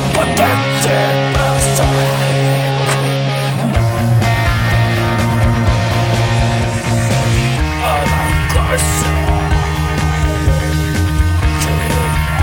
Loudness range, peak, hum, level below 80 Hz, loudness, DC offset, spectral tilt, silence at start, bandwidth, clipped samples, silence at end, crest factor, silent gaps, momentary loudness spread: 1 LU; 0 dBFS; none; -22 dBFS; -14 LUFS; under 0.1%; -5 dB/octave; 0 s; 17 kHz; under 0.1%; 0 s; 12 dB; none; 3 LU